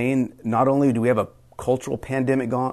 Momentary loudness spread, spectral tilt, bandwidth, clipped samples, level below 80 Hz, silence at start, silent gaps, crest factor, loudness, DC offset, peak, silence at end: 7 LU; -7.5 dB/octave; 13 kHz; under 0.1%; -52 dBFS; 0 s; none; 14 dB; -22 LUFS; under 0.1%; -8 dBFS; 0 s